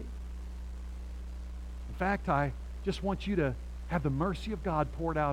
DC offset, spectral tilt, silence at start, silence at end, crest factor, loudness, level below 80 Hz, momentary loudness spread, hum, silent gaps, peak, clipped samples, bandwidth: under 0.1%; -7.5 dB/octave; 0 s; 0 s; 18 dB; -35 LUFS; -40 dBFS; 13 LU; none; none; -16 dBFS; under 0.1%; 11.5 kHz